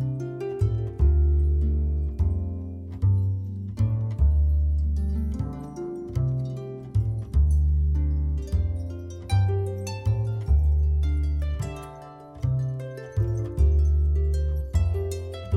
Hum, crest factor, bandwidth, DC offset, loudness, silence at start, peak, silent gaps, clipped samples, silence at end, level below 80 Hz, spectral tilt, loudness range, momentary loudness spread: none; 12 dB; 7.8 kHz; under 0.1%; -26 LUFS; 0 s; -12 dBFS; none; under 0.1%; 0 s; -26 dBFS; -8.5 dB/octave; 2 LU; 11 LU